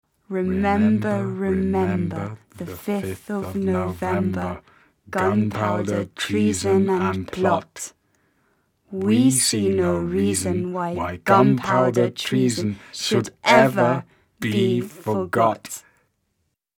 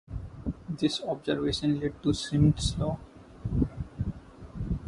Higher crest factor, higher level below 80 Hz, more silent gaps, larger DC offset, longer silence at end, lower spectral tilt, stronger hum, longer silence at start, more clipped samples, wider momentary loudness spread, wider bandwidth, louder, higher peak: about the same, 22 dB vs 18 dB; second, -54 dBFS vs -40 dBFS; neither; neither; first, 0.95 s vs 0 s; about the same, -5 dB/octave vs -6 dB/octave; neither; first, 0.3 s vs 0.1 s; neither; about the same, 13 LU vs 15 LU; first, 18 kHz vs 11.5 kHz; first, -21 LUFS vs -30 LUFS; first, 0 dBFS vs -10 dBFS